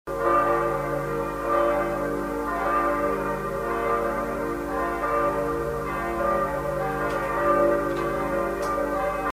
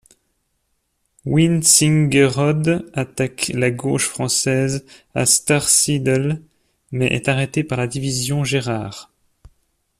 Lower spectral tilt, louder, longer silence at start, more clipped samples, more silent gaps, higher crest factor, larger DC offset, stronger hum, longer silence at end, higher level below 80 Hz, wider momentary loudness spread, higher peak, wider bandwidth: first, -6.5 dB/octave vs -4 dB/octave; second, -25 LUFS vs -17 LUFS; second, 0.05 s vs 1.25 s; neither; neither; about the same, 16 dB vs 20 dB; neither; neither; second, 0 s vs 0.95 s; first, -42 dBFS vs -50 dBFS; second, 6 LU vs 13 LU; second, -10 dBFS vs 0 dBFS; first, 16 kHz vs 14.5 kHz